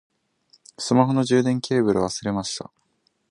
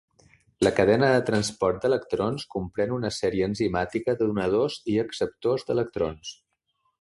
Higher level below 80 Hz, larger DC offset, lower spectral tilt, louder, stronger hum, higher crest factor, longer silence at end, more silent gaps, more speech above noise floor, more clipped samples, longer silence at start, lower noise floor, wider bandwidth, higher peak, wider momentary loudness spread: about the same, -56 dBFS vs -52 dBFS; neither; about the same, -5.5 dB/octave vs -5.5 dB/octave; first, -22 LUFS vs -25 LUFS; neither; about the same, 20 dB vs 20 dB; about the same, 0.65 s vs 0.7 s; neither; about the same, 48 dB vs 49 dB; neither; first, 0.8 s vs 0.6 s; second, -69 dBFS vs -74 dBFS; about the same, 11 kHz vs 11.5 kHz; first, -2 dBFS vs -6 dBFS; first, 13 LU vs 9 LU